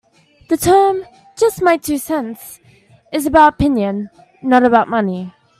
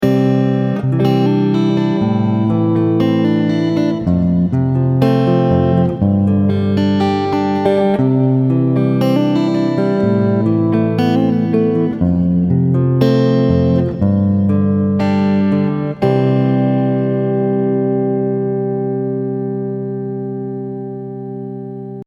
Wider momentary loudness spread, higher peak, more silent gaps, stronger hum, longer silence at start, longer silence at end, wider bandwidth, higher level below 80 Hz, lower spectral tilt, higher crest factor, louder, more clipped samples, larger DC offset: first, 16 LU vs 8 LU; about the same, 0 dBFS vs 0 dBFS; neither; neither; first, 0.5 s vs 0 s; first, 0.3 s vs 0.05 s; first, 16 kHz vs 7 kHz; about the same, -42 dBFS vs -42 dBFS; second, -5 dB/octave vs -9.5 dB/octave; about the same, 16 dB vs 14 dB; about the same, -15 LUFS vs -15 LUFS; neither; neither